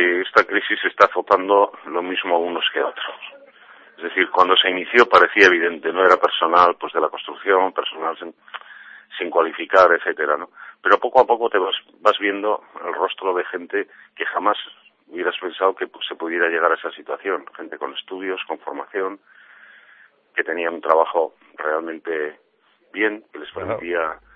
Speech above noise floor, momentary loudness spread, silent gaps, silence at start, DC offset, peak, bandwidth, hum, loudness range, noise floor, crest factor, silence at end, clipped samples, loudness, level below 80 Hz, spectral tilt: 40 dB; 15 LU; none; 0 s; under 0.1%; 0 dBFS; 7.8 kHz; none; 9 LU; -60 dBFS; 20 dB; 0.2 s; under 0.1%; -19 LUFS; -64 dBFS; -3.5 dB/octave